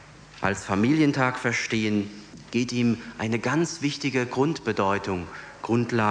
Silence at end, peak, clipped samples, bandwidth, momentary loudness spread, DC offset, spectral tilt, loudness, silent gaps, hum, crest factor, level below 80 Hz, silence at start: 0 s; -6 dBFS; under 0.1%; 10 kHz; 9 LU; under 0.1%; -5.5 dB/octave; -25 LUFS; none; none; 18 dB; -58 dBFS; 0 s